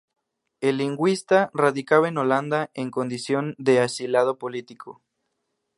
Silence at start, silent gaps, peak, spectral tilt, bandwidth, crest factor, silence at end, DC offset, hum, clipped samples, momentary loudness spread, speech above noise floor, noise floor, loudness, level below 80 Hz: 0.6 s; none; -4 dBFS; -5.5 dB/octave; 11.5 kHz; 20 dB; 0.85 s; under 0.1%; none; under 0.1%; 11 LU; 55 dB; -77 dBFS; -23 LUFS; -74 dBFS